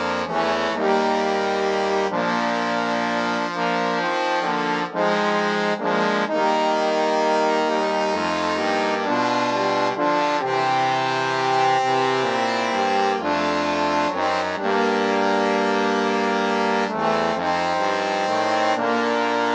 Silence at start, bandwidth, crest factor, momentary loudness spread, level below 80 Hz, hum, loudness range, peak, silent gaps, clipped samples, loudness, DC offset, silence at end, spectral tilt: 0 s; 10 kHz; 14 dB; 2 LU; -62 dBFS; none; 1 LU; -6 dBFS; none; under 0.1%; -21 LUFS; under 0.1%; 0 s; -4.5 dB/octave